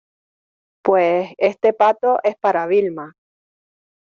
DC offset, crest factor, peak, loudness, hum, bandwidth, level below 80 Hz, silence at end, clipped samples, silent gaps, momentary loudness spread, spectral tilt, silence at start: under 0.1%; 16 dB; -2 dBFS; -18 LUFS; none; 7 kHz; -70 dBFS; 1 s; under 0.1%; none; 9 LU; -4 dB/octave; 0.85 s